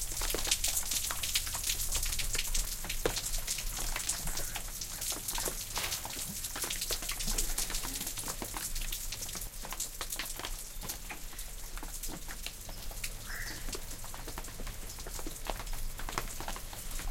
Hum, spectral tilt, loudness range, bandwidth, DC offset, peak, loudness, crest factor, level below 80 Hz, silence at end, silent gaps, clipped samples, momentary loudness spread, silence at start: none; -1 dB/octave; 9 LU; 17 kHz; under 0.1%; -10 dBFS; -36 LUFS; 26 dB; -40 dBFS; 0 s; none; under 0.1%; 11 LU; 0 s